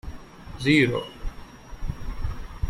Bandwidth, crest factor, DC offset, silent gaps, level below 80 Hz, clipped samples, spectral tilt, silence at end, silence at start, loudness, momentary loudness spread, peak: 14 kHz; 22 dB; under 0.1%; none; -34 dBFS; under 0.1%; -6 dB/octave; 0 s; 0.05 s; -25 LUFS; 25 LU; -6 dBFS